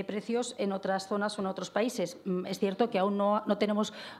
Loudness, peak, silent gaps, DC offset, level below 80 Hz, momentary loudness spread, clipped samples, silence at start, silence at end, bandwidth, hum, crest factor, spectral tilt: -31 LUFS; -14 dBFS; none; under 0.1%; -78 dBFS; 5 LU; under 0.1%; 0 s; 0 s; 14 kHz; none; 18 dB; -5.5 dB/octave